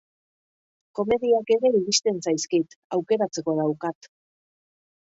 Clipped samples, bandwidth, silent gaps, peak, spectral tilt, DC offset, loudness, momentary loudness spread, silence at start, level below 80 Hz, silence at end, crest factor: under 0.1%; 8 kHz; 2.76-2.90 s; -6 dBFS; -4 dB/octave; under 0.1%; -24 LUFS; 10 LU; 0.95 s; -64 dBFS; 1.15 s; 18 dB